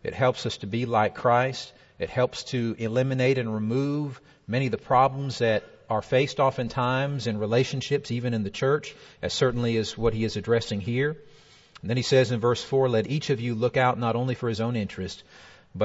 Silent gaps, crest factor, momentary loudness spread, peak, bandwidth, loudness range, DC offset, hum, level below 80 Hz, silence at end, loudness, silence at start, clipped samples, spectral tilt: none; 18 dB; 9 LU; -8 dBFS; 8 kHz; 2 LU; under 0.1%; none; -52 dBFS; 0 s; -26 LUFS; 0.05 s; under 0.1%; -6 dB/octave